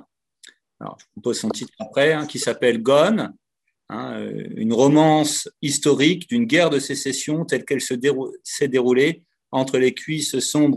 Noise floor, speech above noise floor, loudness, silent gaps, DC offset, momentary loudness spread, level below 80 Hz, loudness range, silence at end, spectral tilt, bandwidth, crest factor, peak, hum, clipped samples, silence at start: -66 dBFS; 46 dB; -20 LUFS; none; under 0.1%; 14 LU; -68 dBFS; 3 LU; 0 s; -4.5 dB/octave; 13 kHz; 18 dB; -2 dBFS; none; under 0.1%; 0.8 s